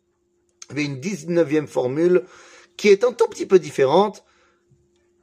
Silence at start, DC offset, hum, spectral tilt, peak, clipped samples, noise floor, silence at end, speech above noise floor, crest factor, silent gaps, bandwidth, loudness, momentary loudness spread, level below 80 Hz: 0.7 s; under 0.1%; none; -5.5 dB/octave; -2 dBFS; under 0.1%; -67 dBFS; 1.05 s; 48 dB; 18 dB; none; 12 kHz; -20 LUFS; 10 LU; -70 dBFS